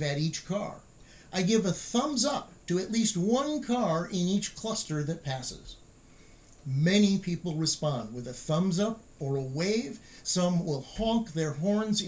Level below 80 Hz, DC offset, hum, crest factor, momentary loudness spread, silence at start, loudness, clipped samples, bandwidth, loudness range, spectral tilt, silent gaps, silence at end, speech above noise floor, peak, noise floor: -56 dBFS; under 0.1%; none; 18 dB; 10 LU; 0 s; -30 LUFS; under 0.1%; 8 kHz; 2 LU; -5 dB/octave; none; 0 s; 26 dB; -12 dBFS; -55 dBFS